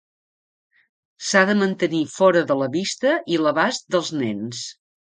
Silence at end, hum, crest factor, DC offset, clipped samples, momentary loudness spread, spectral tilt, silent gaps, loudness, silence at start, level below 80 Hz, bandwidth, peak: 0.35 s; none; 22 dB; under 0.1%; under 0.1%; 12 LU; -4.5 dB/octave; none; -20 LUFS; 1.2 s; -70 dBFS; 9.6 kHz; 0 dBFS